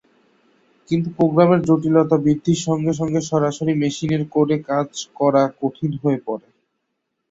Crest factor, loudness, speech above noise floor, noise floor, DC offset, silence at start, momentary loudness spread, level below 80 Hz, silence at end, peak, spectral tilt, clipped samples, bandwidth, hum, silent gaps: 18 dB; -19 LUFS; 57 dB; -75 dBFS; under 0.1%; 0.9 s; 8 LU; -56 dBFS; 0.9 s; -2 dBFS; -7 dB/octave; under 0.1%; 8 kHz; none; none